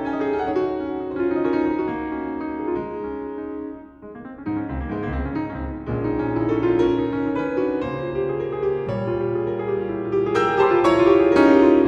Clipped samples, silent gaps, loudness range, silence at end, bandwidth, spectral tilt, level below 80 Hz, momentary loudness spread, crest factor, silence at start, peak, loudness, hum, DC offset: under 0.1%; none; 9 LU; 0 s; 8.4 kHz; -8 dB/octave; -42 dBFS; 14 LU; 18 dB; 0 s; -2 dBFS; -22 LUFS; none; under 0.1%